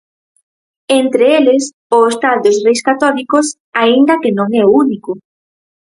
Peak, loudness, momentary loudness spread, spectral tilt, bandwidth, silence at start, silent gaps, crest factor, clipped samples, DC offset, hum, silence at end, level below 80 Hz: 0 dBFS; -12 LUFS; 6 LU; -4 dB/octave; 11.5 kHz; 0.9 s; 1.73-1.90 s, 3.60-3.72 s; 12 dB; under 0.1%; under 0.1%; none; 0.75 s; -60 dBFS